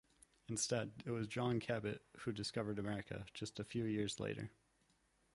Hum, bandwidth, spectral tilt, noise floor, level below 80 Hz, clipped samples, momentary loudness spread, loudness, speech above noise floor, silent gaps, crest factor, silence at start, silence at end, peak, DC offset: none; 11.5 kHz; -4.5 dB/octave; -77 dBFS; -70 dBFS; under 0.1%; 9 LU; -43 LUFS; 35 dB; none; 18 dB; 0.5 s; 0.85 s; -26 dBFS; under 0.1%